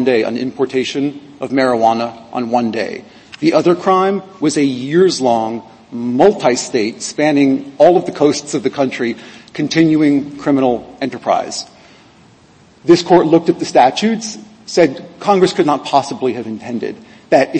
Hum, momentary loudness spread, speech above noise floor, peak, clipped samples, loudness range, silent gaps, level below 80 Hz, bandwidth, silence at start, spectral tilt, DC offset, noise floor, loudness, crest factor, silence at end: none; 13 LU; 32 dB; 0 dBFS; under 0.1%; 3 LU; none; -56 dBFS; 8.8 kHz; 0 s; -5 dB/octave; under 0.1%; -46 dBFS; -15 LUFS; 14 dB; 0 s